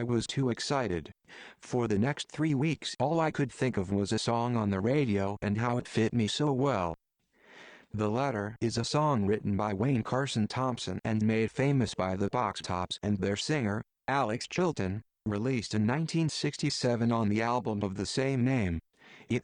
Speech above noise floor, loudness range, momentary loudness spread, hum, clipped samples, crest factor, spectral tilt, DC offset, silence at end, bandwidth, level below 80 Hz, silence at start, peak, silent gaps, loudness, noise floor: 32 dB; 2 LU; 6 LU; none; under 0.1%; 14 dB; -6 dB/octave; under 0.1%; 0.05 s; 10.5 kHz; -58 dBFS; 0 s; -16 dBFS; none; -31 LUFS; -62 dBFS